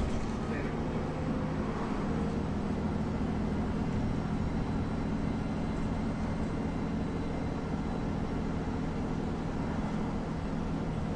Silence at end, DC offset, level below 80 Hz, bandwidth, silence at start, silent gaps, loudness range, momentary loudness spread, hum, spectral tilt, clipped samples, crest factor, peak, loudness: 0 s; under 0.1%; -40 dBFS; 10.5 kHz; 0 s; none; 1 LU; 2 LU; none; -8 dB/octave; under 0.1%; 12 dB; -20 dBFS; -34 LUFS